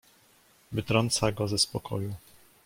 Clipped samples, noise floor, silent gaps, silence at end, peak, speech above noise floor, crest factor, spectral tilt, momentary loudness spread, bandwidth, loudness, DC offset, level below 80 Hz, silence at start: under 0.1%; -62 dBFS; none; 0.45 s; -8 dBFS; 33 dB; 22 dB; -4 dB/octave; 11 LU; 16.5 kHz; -28 LUFS; under 0.1%; -56 dBFS; 0.7 s